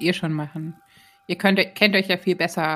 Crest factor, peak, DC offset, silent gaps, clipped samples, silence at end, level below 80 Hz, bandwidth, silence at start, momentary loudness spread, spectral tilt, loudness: 20 dB; -2 dBFS; under 0.1%; none; under 0.1%; 0 s; -68 dBFS; 15.5 kHz; 0 s; 14 LU; -5.5 dB/octave; -21 LUFS